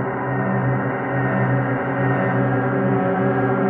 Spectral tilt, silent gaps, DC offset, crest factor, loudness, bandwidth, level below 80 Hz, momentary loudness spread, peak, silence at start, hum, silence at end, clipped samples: -11.5 dB/octave; none; under 0.1%; 14 dB; -20 LUFS; 3.5 kHz; -52 dBFS; 3 LU; -6 dBFS; 0 s; none; 0 s; under 0.1%